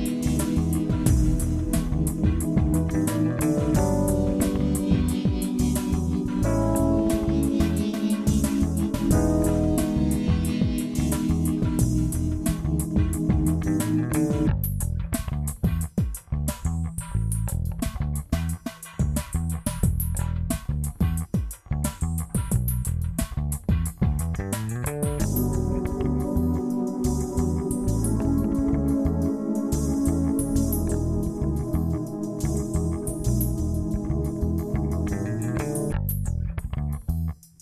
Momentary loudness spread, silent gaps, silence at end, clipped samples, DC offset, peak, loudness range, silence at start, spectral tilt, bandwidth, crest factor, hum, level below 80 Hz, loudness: 6 LU; none; 0.25 s; under 0.1%; under 0.1%; -6 dBFS; 4 LU; 0 s; -7 dB/octave; 14 kHz; 18 dB; none; -30 dBFS; -25 LUFS